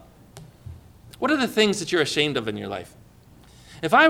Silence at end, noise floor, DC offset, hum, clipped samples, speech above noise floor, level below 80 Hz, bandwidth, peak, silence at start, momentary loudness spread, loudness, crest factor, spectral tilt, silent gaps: 0 s; -51 dBFS; under 0.1%; none; under 0.1%; 29 dB; -56 dBFS; 18.5 kHz; -4 dBFS; 0.35 s; 24 LU; -23 LUFS; 22 dB; -4 dB/octave; none